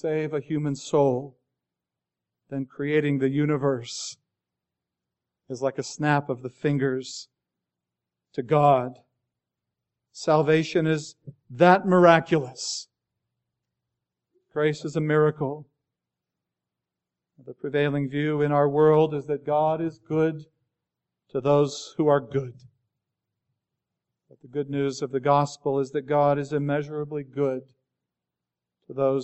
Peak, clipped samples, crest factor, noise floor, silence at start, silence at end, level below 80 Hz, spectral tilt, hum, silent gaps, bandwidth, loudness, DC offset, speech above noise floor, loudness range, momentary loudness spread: -2 dBFS; under 0.1%; 24 dB; -88 dBFS; 0.05 s; 0 s; -68 dBFS; -6.5 dB/octave; none; none; 8.2 kHz; -24 LUFS; under 0.1%; 64 dB; 7 LU; 15 LU